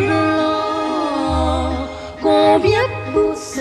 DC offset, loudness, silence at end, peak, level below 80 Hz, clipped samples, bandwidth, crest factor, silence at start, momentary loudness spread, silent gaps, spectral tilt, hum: under 0.1%; -17 LUFS; 0 s; -4 dBFS; -32 dBFS; under 0.1%; 12.5 kHz; 14 dB; 0 s; 9 LU; none; -5.5 dB/octave; none